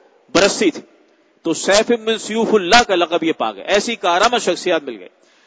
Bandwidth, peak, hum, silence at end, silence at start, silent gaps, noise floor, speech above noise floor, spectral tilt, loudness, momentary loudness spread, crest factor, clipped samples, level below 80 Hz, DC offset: 8 kHz; 0 dBFS; none; 0.4 s; 0.35 s; none; -54 dBFS; 38 dB; -2.5 dB/octave; -16 LUFS; 11 LU; 18 dB; under 0.1%; -50 dBFS; under 0.1%